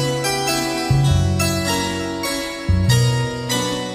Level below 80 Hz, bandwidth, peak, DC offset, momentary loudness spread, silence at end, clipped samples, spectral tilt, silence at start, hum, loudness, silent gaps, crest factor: -32 dBFS; 16 kHz; -4 dBFS; under 0.1%; 6 LU; 0 s; under 0.1%; -4.5 dB/octave; 0 s; none; -19 LUFS; none; 14 dB